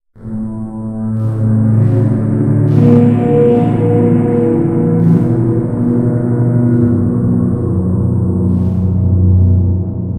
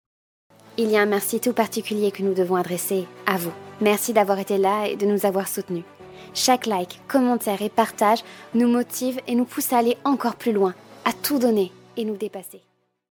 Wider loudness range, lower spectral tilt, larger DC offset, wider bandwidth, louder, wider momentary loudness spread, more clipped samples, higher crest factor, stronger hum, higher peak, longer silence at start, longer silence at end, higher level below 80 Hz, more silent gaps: about the same, 2 LU vs 1 LU; first, -11.5 dB/octave vs -4 dB/octave; neither; second, 3.3 kHz vs 19 kHz; first, -12 LUFS vs -23 LUFS; about the same, 7 LU vs 9 LU; neither; second, 12 dB vs 22 dB; neither; about the same, 0 dBFS vs 0 dBFS; second, 0.15 s vs 0.8 s; second, 0 s vs 0.55 s; first, -34 dBFS vs -70 dBFS; neither